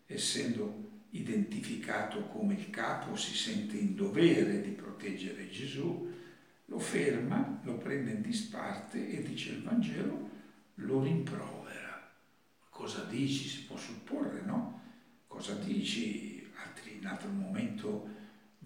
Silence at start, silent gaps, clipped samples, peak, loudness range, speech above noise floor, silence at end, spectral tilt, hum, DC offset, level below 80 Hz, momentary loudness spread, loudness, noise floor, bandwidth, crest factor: 0.1 s; none; under 0.1%; -14 dBFS; 6 LU; 34 dB; 0 s; -5 dB/octave; none; under 0.1%; -84 dBFS; 14 LU; -36 LUFS; -69 dBFS; 16.5 kHz; 24 dB